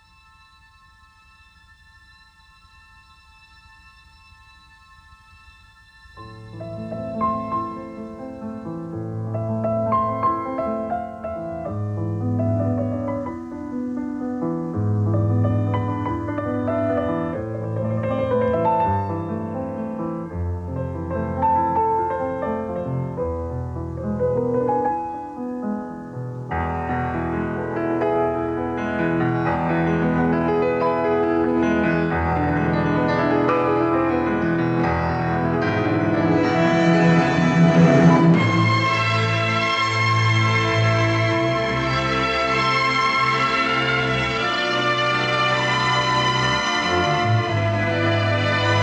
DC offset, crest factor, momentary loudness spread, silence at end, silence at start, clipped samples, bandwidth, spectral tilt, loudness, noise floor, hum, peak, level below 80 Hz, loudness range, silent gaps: under 0.1%; 18 dB; 11 LU; 0 s; 6.15 s; under 0.1%; 8.8 kHz; -6.5 dB/octave; -21 LUFS; -52 dBFS; none; -2 dBFS; -44 dBFS; 9 LU; none